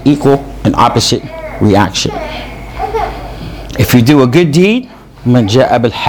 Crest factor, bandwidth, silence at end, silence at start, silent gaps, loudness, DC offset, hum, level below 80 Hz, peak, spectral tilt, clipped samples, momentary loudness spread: 10 dB; over 20 kHz; 0 s; 0 s; none; -10 LUFS; under 0.1%; none; -30 dBFS; 0 dBFS; -5.5 dB/octave; 0.9%; 16 LU